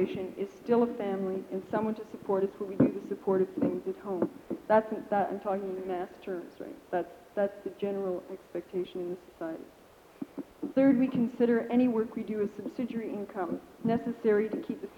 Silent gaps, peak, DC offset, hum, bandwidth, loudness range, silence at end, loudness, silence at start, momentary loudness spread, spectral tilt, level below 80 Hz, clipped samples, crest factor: none; -12 dBFS; under 0.1%; none; 18.5 kHz; 7 LU; 0 s; -31 LUFS; 0 s; 13 LU; -8.5 dB/octave; -68 dBFS; under 0.1%; 20 dB